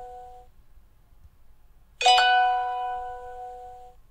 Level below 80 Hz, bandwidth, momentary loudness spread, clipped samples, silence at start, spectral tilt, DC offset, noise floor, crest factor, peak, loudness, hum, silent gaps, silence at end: -54 dBFS; 13 kHz; 25 LU; under 0.1%; 0 s; 1 dB/octave; under 0.1%; -53 dBFS; 22 dB; -6 dBFS; -22 LUFS; none; none; 0.25 s